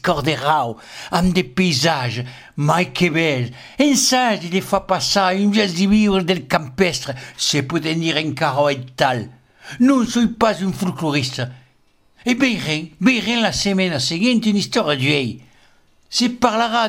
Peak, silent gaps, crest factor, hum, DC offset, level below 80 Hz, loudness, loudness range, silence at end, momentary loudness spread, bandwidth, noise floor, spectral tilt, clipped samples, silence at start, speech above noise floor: 0 dBFS; none; 18 dB; none; under 0.1%; -46 dBFS; -18 LUFS; 3 LU; 0 s; 9 LU; 16.5 kHz; -57 dBFS; -4.5 dB/octave; under 0.1%; 0.05 s; 39 dB